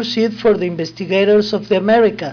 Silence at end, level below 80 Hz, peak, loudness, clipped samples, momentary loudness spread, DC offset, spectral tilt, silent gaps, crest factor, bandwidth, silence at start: 0 s; -52 dBFS; -4 dBFS; -15 LUFS; under 0.1%; 6 LU; under 0.1%; -6 dB/octave; none; 10 dB; 5.4 kHz; 0 s